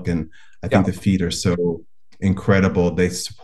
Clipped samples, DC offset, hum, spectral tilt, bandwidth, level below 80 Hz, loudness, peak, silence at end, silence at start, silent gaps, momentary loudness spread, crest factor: under 0.1%; 0.9%; none; -6 dB/octave; 12.5 kHz; -46 dBFS; -20 LUFS; -2 dBFS; 0.1 s; 0 s; none; 10 LU; 18 dB